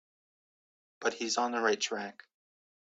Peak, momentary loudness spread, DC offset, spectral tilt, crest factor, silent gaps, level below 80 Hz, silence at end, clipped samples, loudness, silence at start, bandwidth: -14 dBFS; 9 LU; under 0.1%; -1.5 dB/octave; 22 dB; none; -82 dBFS; 0.7 s; under 0.1%; -32 LUFS; 1 s; 9 kHz